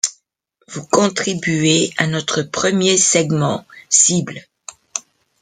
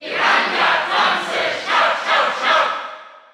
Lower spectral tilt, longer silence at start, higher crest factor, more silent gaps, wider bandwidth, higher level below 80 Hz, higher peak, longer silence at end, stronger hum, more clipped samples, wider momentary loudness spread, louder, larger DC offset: first, -3 dB/octave vs -1.5 dB/octave; about the same, 0.05 s vs 0 s; about the same, 18 dB vs 16 dB; neither; second, 11 kHz vs 14 kHz; first, -58 dBFS vs -72 dBFS; about the same, 0 dBFS vs -2 dBFS; first, 0.4 s vs 0.15 s; neither; neither; first, 17 LU vs 5 LU; about the same, -15 LUFS vs -16 LUFS; neither